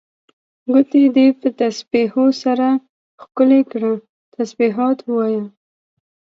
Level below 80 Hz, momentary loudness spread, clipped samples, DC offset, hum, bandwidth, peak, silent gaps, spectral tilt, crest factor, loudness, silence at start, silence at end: -68 dBFS; 13 LU; under 0.1%; under 0.1%; none; 7.4 kHz; 0 dBFS; 2.89-3.18 s, 4.09-4.32 s; -6 dB/octave; 16 dB; -17 LUFS; 0.7 s; 0.8 s